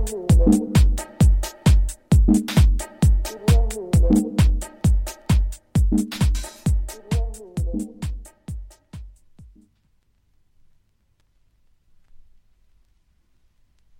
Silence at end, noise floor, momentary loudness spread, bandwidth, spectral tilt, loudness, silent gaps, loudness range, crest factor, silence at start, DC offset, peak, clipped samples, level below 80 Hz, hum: 4.9 s; -64 dBFS; 16 LU; 16.5 kHz; -6.5 dB/octave; -21 LUFS; none; 15 LU; 16 dB; 0 s; under 0.1%; -4 dBFS; under 0.1%; -24 dBFS; none